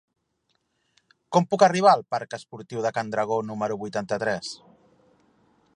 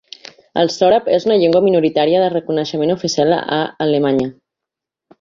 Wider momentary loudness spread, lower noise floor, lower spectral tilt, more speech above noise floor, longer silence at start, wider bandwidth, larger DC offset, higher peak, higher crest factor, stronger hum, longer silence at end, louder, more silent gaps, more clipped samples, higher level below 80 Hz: first, 17 LU vs 7 LU; second, -73 dBFS vs -84 dBFS; about the same, -5 dB/octave vs -5.5 dB/octave; second, 50 dB vs 69 dB; first, 1.3 s vs 0.55 s; first, 11 kHz vs 7.6 kHz; neither; about the same, -4 dBFS vs -2 dBFS; first, 22 dB vs 14 dB; neither; first, 1.2 s vs 0.9 s; second, -24 LUFS vs -15 LUFS; neither; neither; second, -70 dBFS vs -56 dBFS